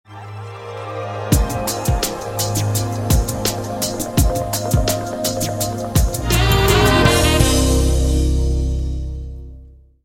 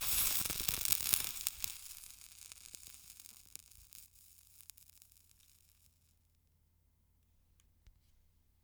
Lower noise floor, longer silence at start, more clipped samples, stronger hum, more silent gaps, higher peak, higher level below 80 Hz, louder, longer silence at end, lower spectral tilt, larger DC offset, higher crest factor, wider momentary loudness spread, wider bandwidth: second, -42 dBFS vs -73 dBFS; about the same, 0.1 s vs 0 s; neither; neither; neither; first, 0 dBFS vs -6 dBFS; first, -22 dBFS vs -62 dBFS; first, -18 LUFS vs -33 LUFS; second, 0.3 s vs 0.75 s; first, -4.5 dB/octave vs 0.5 dB/octave; neither; second, 16 dB vs 38 dB; second, 16 LU vs 25 LU; second, 16.5 kHz vs over 20 kHz